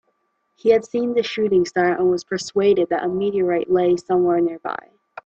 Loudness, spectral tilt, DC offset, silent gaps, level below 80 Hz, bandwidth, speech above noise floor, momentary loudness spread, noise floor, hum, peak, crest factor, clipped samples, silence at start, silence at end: -20 LUFS; -5.5 dB/octave; under 0.1%; none; -60 dBFS; 8 kHz; 50 dB; 6 LU; -69 dBFS; none; -4 dBFS; 16 dB; under 0.1%; 0.65 s; 0.5 s